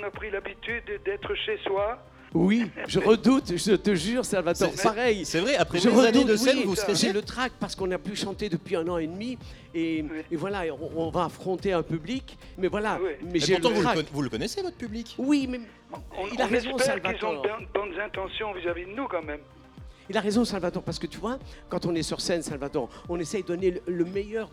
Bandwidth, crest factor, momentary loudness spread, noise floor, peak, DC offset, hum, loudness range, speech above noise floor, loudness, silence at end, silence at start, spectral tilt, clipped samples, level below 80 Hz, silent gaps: 15.5 kHz; 20 dB; 11 LU; -47 dBFS; -6 dBFS; under 0.1%; none; 8 LU; 20 dB; -27 LUFS; 0 s; 0 s; -4.5 dB/octave; under 0.1%; -50 dBFS; none